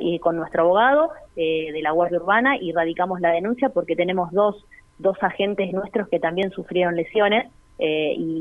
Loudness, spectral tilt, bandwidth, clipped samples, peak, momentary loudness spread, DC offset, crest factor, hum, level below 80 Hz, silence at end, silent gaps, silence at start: -21 LUFS; -7.5 dB/octave; 3.9 kHz; under 0.1%; -4 dBFS; 7 LU; under 0.1%; 18 dB; none; -56 dBFS; 0 s; none; 0 s